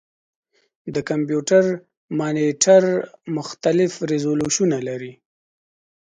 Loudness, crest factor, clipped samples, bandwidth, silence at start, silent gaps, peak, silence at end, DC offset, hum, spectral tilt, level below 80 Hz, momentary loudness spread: -20 LUFS; 20 dB; under 0.1%; 9.6 kHz; 0.85 s; 1.97-2.08 s; -2 dBFS; 1 s; under 0.1%; none; -4.5 dB/octave; -62 dBFS; 14 LU